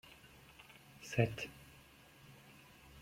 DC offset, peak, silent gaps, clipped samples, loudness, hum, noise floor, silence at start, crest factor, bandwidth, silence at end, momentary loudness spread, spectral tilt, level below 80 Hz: under 0.1%; -16 dBFS; none; under 0.1%; -39 LUFS; none; -62 dBFS; 0.05 s; 30 dB; 16.5 kHz; 0 s; 23 LU; -6 dB/octave; -68 dBFS